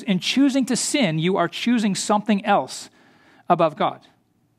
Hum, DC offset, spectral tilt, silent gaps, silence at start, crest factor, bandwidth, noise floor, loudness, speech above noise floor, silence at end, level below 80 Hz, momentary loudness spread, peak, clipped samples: none; under 0.1%; -4.5 dB/octave; none; 0 s; 20 dB; 14.5 kHz; -54 dBFS; -21 LUFS; 33 dB; 0.6 s; -72 dBFS; 6 LU; -2 dBFS; under 0.1%